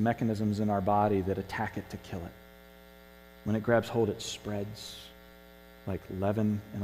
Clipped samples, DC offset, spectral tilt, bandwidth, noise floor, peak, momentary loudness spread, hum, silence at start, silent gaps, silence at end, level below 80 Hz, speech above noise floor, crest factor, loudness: under 0.1%; under 0.1%; -6.5 dB/octave; 15.5 kHz; -54 dBFS; -12 dBFS; 15 LU; 50 Hz at -60 dBFS; 0 s; none; 0 s; -58 dBFS; 23 dB; 20 dB; -32 LUFS